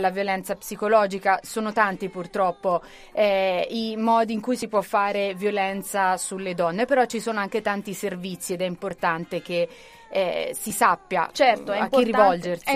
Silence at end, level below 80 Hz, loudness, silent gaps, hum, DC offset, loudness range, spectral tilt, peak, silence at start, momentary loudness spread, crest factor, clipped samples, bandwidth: 0 s; -60 dBFS; -24 LUFS; none; none; under 0.1%; 3 LU; -4 dB/octave; -4 dBFS; 0 s; 9 LU; 20 dB; under 0.1%; 15.5 kHz